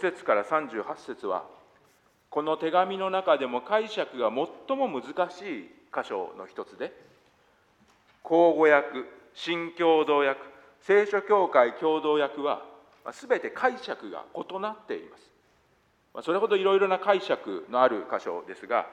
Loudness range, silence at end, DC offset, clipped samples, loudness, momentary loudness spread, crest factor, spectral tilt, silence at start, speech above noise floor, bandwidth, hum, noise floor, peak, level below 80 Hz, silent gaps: 9 LU; 0 s; under 0.1%; under 0.1%; -27 LUFS; 16 LU; 22 dB; -5 dB/octave; 0 s; 40 dB; 9.4 kHz; none; -66 dBFS; -6 dBFS; -78 dBFS; none